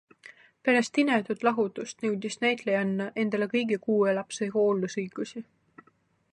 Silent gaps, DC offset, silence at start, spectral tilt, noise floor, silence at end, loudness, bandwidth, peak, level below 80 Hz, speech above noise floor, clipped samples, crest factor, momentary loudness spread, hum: none; under 0.1%; 0.25 s; -5 dB/octave; -67 dBFS; 0.9 s; -28 LUFS; 11 kHz; -10 dBFS; -78 dBFS; 40 dB; under 0.1%; 18 dB; 8 LU; none